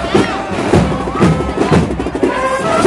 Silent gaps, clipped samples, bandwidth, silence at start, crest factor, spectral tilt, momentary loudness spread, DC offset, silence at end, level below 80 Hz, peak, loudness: none; 0.1%; 11.5 kHz; 0 s; 14 dB; -6.5 dB/octave; 4 LU; under 0.1%; 0 s; -30 dBFS; 0 dBFS; -14 LUFS